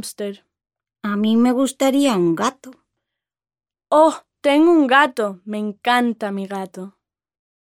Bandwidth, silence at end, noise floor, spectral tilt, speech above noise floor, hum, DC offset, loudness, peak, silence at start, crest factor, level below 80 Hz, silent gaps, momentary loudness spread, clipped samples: 16 kHz; 0.7 s; under -90 dBFS; -4.5 dB/octave; over 72 dB; none; under 0.1%; -18 LUFS; 0 dBFS; 0.05 s; 18 dB; -68 dBFS; none; 16 LU; under 0.1%